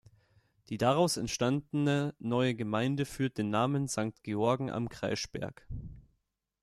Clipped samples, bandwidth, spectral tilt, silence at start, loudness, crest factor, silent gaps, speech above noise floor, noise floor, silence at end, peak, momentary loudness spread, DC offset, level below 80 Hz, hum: under 0.1%; 13.5 kHz; -5.5 dB/octave; 0.7 s; -32 LUFS; 18 dB; none; 48 dB; -80 dBFS; 0.6 s; -14 dBFS; 12 LU; under 0.1%; -58 dBFS; none